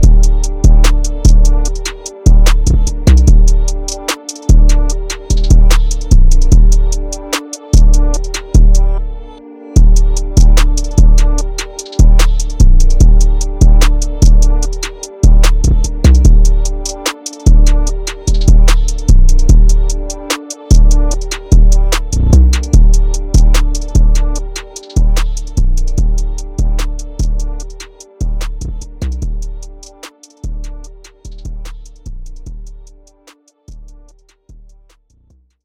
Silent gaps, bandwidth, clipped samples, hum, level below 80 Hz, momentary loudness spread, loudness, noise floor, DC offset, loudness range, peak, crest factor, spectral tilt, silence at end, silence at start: none; 12 kHz; under 0.1%; none; -8 dBFS; 17 LU; -13 LUFS; -50 dBFS; under 0.1%; 13 LU; 0 dBFS; 8 dB; -5 dB/octave; 1.8 s; 0 s